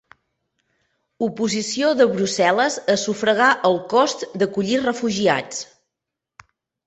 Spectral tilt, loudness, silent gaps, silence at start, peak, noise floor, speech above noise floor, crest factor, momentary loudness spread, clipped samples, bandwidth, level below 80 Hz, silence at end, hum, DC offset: -3.5 dB/octave; -19 LUFS; none; 1.2 s; -2 dBFS; -84 dBFS; 65 dB; 18 dB; 8 LU; under 0.1%; 8.4 kHz; -64 dBFS; 1.2 s; none; under 0.1%